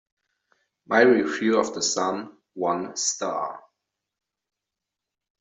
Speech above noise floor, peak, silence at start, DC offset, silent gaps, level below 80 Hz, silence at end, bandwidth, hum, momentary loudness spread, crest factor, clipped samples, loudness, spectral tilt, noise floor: 63 dB; -4 dBFS; 0.9 s; under 0.1%; none; -72 dBFS; 1.8 s; 8.2 kHz; none; 16 LU; 22 dB; under 0.1%; -23 LUFS; -2.5 dB/octave; -86 dBFS